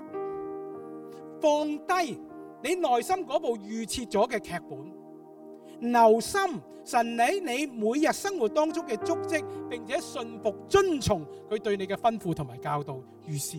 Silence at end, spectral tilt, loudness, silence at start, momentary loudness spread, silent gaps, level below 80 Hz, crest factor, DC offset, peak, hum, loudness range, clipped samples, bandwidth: 0 s; -4.5 dB/octave; -28 LUFS; 0 s; 17 LU; none; -58 dBFS; 20 dB; under 0.1%; -8 dBFS; none; 4 LU; under 0.1%; 17.5 kHz